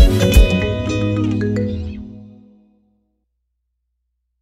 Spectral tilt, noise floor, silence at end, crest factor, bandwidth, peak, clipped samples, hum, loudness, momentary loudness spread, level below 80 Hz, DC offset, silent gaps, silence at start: -6 dB/octave; -72 dBFS; 2.15 s; 16 dB; 15.5 kHz; 0 dBFS; under 0.1%; none; -17 LUFS; 17 LU; -20 dBFS; under 0.1%; none; 0 s